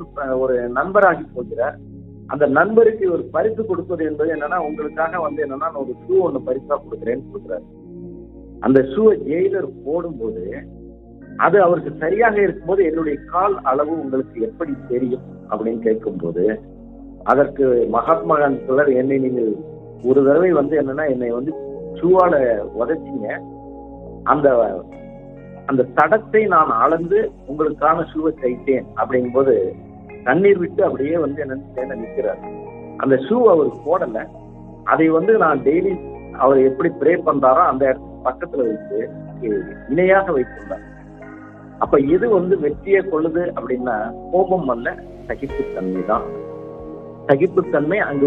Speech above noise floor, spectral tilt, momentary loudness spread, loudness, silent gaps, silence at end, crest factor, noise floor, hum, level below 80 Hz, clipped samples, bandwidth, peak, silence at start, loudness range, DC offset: 22 dB; -10 dB/octave; 17 LU; -18 LUFS; none; 0 s; 18 dB; -39 dBFS; none; -46 dBFS; under 0.1%; 4 kHz; 0 dBFS; 0 s; 5 LU; under 0.1%